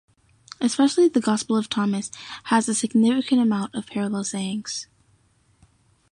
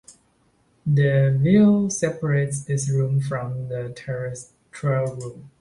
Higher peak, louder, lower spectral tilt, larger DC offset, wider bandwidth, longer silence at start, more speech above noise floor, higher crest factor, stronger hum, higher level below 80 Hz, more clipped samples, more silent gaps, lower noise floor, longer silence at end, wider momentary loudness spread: about the same, -6 dBFS vs -6 dBFS; about the same, -22 LUFS vs -22 LUFS; second, -4.5 dB/octave vs -7 dB/octave; neither; about the same, 11.5 kHz vs 11.5 kHz; first, 0.6 s vs 0.1 s; about the same, 40 dB vs 42 dB; about the same, 16 dB vs 16 dB; neither; second, -66 dBFS vs -56 dBFS; neither; neither; about the same, -62 dBFS vs -63 dBFS; first, 1.3 s vs 0.1 s; second, 11 LU vs 16 LU